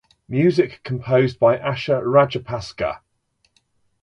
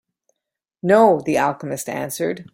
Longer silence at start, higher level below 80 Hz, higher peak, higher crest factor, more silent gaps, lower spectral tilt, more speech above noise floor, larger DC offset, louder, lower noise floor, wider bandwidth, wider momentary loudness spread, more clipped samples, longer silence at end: second, 0.3 s vs 0.85 s; first, -52 dBFS vs -62 dBFS; about the same, -2 dBFS vs -2 dBFS; about the same, 18 dB vs 18 dB; neither; first, -7.5 dB/octave vs -5.5 dB/octave; second, 48 dB vs 64 dB; neither; about the same, -20 LUFS vs -19 LUFS; second, -67 dBFS vs -83 dBFS; second, 10 kHz vs 16.5 kHz; about the same, 11 LU vs 13 LU; neither; first, 1.05 s vs 0.1 s